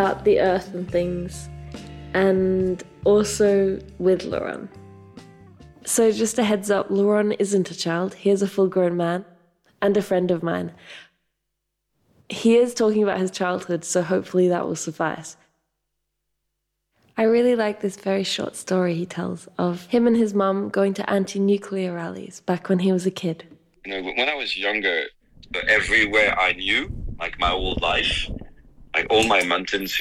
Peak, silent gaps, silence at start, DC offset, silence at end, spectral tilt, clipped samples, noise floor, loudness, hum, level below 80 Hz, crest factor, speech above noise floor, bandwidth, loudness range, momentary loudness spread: -6 dBFS; none; 0 s; under 0.1%; 0 s; -4.5 dB/octave; under 0.1%; -78 dBFS; -22 LUFS; none; -44 dBFS; 16 dB; 57 dB; 14.5 kHz; 5 LU; 13 LU